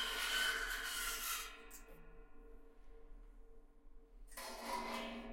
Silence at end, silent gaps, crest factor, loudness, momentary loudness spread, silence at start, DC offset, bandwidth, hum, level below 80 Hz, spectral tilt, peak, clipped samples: 0 s; none; 20 dB; -41 LUFS; 27 LU; 0 s; under 0.1%; 16.5 kHz; none; -58 dBFS; 0 dB/octave; -26 dBFS; under 0.1%